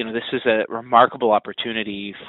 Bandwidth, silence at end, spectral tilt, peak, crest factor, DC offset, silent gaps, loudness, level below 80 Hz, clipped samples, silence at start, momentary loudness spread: 4.1 kHz; 0 s; -2 dB/octave; 0 dBFS; 20 dB; under 0.1%; none; -20 LUFS; -62 dBFS; under 0.1%; 0 s; 10 LU